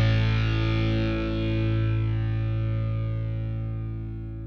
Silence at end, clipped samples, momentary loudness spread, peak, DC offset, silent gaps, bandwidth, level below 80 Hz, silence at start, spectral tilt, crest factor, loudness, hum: 0 s; under 0.1%; 8 LU; -12 dBFS; under 0.1%; none; 6 kHz; -34 dBFS; 0 s; -8.5 dB/octave; 14 dB; -27 LUFS; none